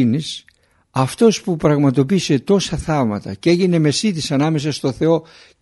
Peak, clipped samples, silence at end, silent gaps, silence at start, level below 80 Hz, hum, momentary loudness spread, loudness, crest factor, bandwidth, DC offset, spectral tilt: -2 dBFS; under 0.1%; 0.4 s; none; 0 s; -44 dBFS; none; 7 LU; -17 LUFS; 16 dB; 11.5 kHz; under 0.1%; -6 dB/octave